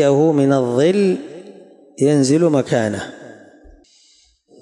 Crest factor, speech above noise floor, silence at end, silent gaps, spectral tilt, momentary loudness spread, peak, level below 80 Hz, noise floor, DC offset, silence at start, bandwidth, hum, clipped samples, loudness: 14 dB; 40 dB; 1.3 s; none; -6.5 dB/octave; 15 LU; -4 dBFS; -58 dBFS; -55 dBFS; under 0.1%; 0 s; 11.5 kHz; none; under 0.1%; -16 LUFS